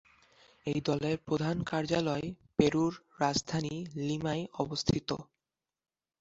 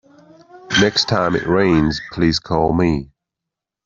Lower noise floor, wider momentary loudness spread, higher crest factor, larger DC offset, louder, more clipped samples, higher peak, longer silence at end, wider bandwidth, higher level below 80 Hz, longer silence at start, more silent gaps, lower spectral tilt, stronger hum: first, under -90 dBFS vs -84 dBFS; first, 8 LU vs 5 LU; first, 26 dB vs 16 dB; neither; second, -33 LUFS vs -17 LUFS; neither; second, -8 dBFS vs -2 dBFS; first, 0.95 s vs 0.8 s; about the same, 8 kHz vs 7.6 kHz; second, -58 dBFS vs -40 dBFS; about the same, 0.65 s vs 0.55 s; neither; about the same, -5.5 dB/octave vs -5 dB/octave; neither